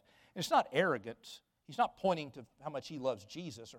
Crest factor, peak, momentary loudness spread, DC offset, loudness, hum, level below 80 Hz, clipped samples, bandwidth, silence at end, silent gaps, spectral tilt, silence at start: 20 dB; -18 dBFS; 18 LU; under 0.1%; -36 LUFS; none; -76 dBFS; under 0.1%; 17 kHz; 0 s; none; -4.5 dB/octave; 0.35 s